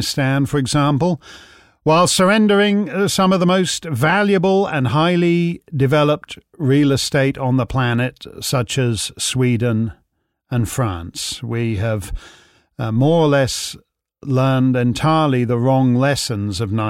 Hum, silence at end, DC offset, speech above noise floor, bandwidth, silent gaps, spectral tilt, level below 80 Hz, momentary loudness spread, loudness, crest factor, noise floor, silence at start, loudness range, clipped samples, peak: none; 0 s; under 0.1%; 51 dB; 16 kHz; none; -5.5 dB/octave; -44 dBFS; 10 LU; -17 LUFS; 12 dB; -67 dBFS; 0 s; 5 LU; under 0.1%; -4 dBFS